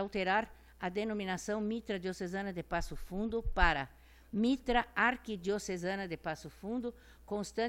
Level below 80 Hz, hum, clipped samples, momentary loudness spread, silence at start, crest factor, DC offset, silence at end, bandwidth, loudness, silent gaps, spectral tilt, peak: -46 dBFS; none; under 0.1%; 11 LU; 0 s; 24 dB; under 0.1%; 0 s; 16.5 kHz; -36 LUFS; none; -5 dB/octave; -12 dBFS